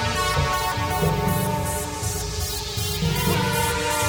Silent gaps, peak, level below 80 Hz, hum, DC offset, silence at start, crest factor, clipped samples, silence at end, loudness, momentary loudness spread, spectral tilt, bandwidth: none; -8 dBFS; -36 dBFS; none; under 0.1%; 0 s; 14 dB; under 0.1%; 0 s; -23 LUFS; 5 LU; -4 dB/octave; over 20 kHz